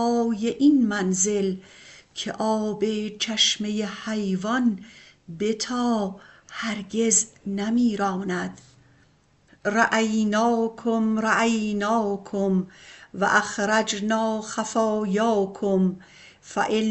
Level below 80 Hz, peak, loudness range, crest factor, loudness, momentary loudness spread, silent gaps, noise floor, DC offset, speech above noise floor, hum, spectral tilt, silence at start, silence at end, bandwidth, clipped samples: -60 dBFS; -6 dBFS; 3 LU; 18 dB; -24 LUFS; 11 LU; none; -60 dBFS; under 0.1%; 36 dB; none; -3.5 dB/octave; 0 s; 0 s; 8.4 kHz; under 0.1%